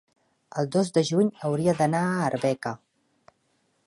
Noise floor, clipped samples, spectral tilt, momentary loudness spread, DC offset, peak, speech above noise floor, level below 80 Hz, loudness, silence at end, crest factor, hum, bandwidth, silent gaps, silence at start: -70 dBFS; under 0.1%; -6 dB/octave; 10 LU; under 0.1%; -8 dBFS; 46 dB; -66 dBFS; -25 LUFS; 1.1 s; 18 dB; none; 11.5 kHz; none; 0.55 s